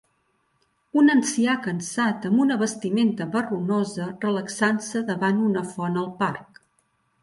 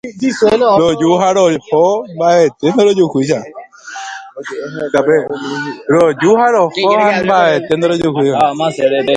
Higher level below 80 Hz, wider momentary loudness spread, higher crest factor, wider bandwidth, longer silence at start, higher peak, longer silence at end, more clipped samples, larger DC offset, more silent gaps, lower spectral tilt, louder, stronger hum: second, -68 dBFS vs -52 dBFS; second, 8 LU vs 14 LU; about the same, 16 dB vs 12 dB; about the same, 11.5 kHz vs 10.5 kHz; first, 0.95 s vs 0.05 s; second, -8 dBFS vs 0 dBFS; first, 0.8 s vs 0 s; neither; neither; neither; about the same, -5 dB/octave vs -5.5 dB/octave; second, -23 LUFS vs -12 LUFS; neither